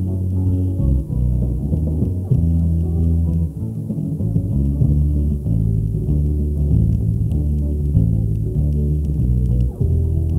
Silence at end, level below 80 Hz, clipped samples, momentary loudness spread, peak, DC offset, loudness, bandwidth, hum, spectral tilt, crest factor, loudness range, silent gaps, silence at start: 0 s; -22 dBFS; under 0.1%; 3 LU; -2 dBFS; under 0.1%; -19 LUFS; 1.2 kHz; none; -11.5 dB/octave; 16 dB; 1 LU; none; 0 s